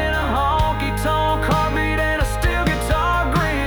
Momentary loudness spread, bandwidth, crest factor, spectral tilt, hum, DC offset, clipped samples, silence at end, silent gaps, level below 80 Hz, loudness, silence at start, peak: 2 LU; over 20 kHz; 12 dB; -5.5 dB/octave; none; under 0.1%; under 0.1%; 0 s; none; -24 dBFS; -19 LUFS; 0 s; -8 dBFS